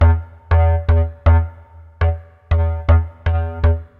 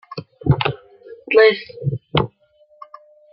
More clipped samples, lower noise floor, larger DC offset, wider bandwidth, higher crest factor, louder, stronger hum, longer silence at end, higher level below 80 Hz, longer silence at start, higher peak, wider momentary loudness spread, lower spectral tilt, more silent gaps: neither; second, -41 dBFS vs -55 dBFS; neither; second, 4.1 kHz vs 5.6 kHz; second, 14 dB vs 20 dB; about the same, -18 LUFS vs -18 LUFS; neither; second, 0.15 s vs 1.05 s; first, -22 dBFS vs -44 dBFS; about the same, 0 s vs 0.1 s; about the same, -2 dBFS vs -2 dBFS; second, 6 LU vs 15 LU; about the same, -10 dB/octave vs -9.5 dB/octave; neither